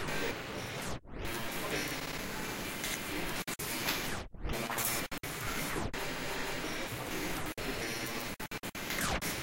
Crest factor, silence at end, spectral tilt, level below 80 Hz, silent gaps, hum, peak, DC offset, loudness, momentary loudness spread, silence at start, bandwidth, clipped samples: 18 dB; 0 s; -3 dB/octave; -48 dBFS; none; none; -18 dBFS; under 0.1%; -37 LUFS; 6 LU; 0 s; 17 kHz; under 0.1%